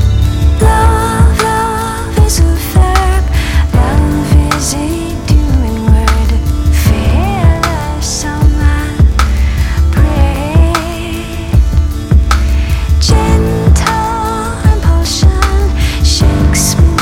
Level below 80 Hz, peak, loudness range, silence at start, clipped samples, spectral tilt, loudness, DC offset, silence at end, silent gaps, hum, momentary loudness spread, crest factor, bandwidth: -12 dBFS; 0 dBFS; 1 LU; 0 s; 0.8%; -5.5 dB/octave; -11 LUFS; under 0.1%; 0 s; none; none; 5 LU; 10 dB; 16.5 kHz